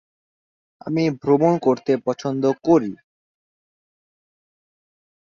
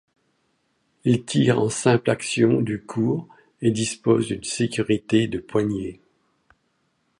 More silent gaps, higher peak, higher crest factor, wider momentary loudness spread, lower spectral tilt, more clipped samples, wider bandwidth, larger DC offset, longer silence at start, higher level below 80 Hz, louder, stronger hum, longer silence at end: neither; about the same, -4 dBFS vs -4 dBFS; about the same, 18 dB vs 18 dB; about the same, 9 LU vs 7 LU; first, -7.5 dB/octave vs -5.5 dB/octave; neither; second, 7.2 kHz vs 11.5 kHz; neither; second, 0.85 s vs 1.05 s; second, -64 dBFS vs -56 dBFS; about the same, -20 LUFS vs -22 LUFS; neither; first, 2.3 s vs 1.25 s